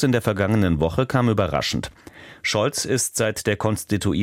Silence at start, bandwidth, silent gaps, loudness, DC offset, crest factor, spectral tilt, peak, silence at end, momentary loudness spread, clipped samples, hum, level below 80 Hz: 0 s; 16.5 kHz; none; -22 LUFS; under 0.1%; 16 dB; -5 dB/octave; -4 dBFS; 0 s; 5 LU; under 0.1%; none; -42 dBFS